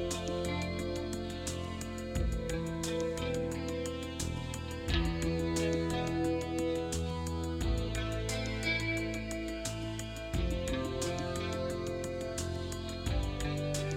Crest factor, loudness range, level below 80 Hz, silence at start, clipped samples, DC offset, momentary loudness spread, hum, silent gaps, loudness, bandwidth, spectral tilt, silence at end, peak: 20 dB; 2 LU; -42 dBFS; 0 s; under 0.1%; under 0.1%; 6 LU; none; none; -35 LUFS; 16 kHz; -5 dB/octave; 0 s; -16 dBFS